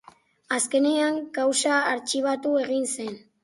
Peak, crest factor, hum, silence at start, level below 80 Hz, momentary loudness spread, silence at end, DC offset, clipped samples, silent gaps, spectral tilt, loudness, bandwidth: -10 dBFS; 16 dB; none; 0.5 s; -74 dBFS; 8 LU; 0.25 s; under 0.1%; under 0.1%; none; -1.5 dB/octave; -24 LUFS; 11.5 kHz